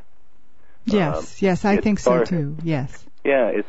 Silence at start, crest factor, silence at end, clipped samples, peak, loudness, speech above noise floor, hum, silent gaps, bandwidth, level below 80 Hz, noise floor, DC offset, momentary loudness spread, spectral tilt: 0.85 s; 16 dB; 0.05 s; under 0.1%; -6 dBFS; -21 LUFS; 39 dB; none; none; 8 kHz; -44 dBFS; -59 dBFS; 2%; 8 LU; -7 dB/octave